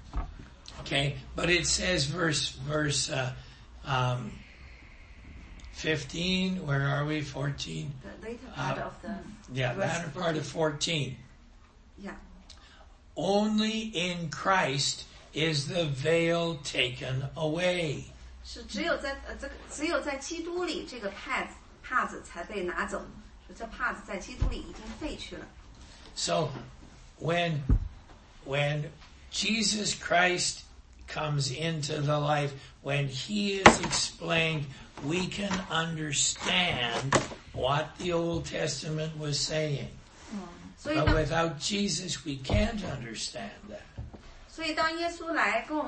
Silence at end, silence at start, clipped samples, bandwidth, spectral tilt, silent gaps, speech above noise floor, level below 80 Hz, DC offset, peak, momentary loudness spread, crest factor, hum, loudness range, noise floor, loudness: 0 s; 0 s; under 0.1%; 8.8 kHz; -4 dB/octave; none; 25 dB; -44 dBFS; under 0.1%; 0 dBFS; 18 LU; 30 dB; none; 8 LU; -55 dBFS; -30 LUFS